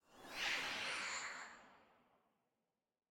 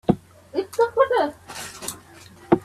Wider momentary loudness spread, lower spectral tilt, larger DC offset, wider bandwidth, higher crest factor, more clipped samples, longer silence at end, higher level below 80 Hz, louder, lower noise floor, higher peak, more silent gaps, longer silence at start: about the same, 14 LU vs 15 LU; second, 0 dB/octave vs -5.5 dB/octave; neither; first, 19 kHz vs 15.5 kHz; about the same, 20 dB vs 22 dB; neither; first, 1.25 s vs 0.05 s; second, -80 dBFS vs -54 dBFS; second, -43 LUFS vs -24 LUFS; first, under -90 dBFS vs -46 dBFS; second, -28 dBFS vs -2 dBFS; neither; about the same, 0.1 s vs 0.1 s